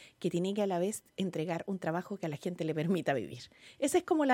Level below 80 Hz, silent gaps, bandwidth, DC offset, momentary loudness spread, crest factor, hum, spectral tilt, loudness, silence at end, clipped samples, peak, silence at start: -74 dBFS; none; 17 kHz; under 0.1%; 7 LU; 18 dB; none; -5.5 dB/octave; -34 LUFS; 0 s; under 0.1%; -16 dBFS; 0 s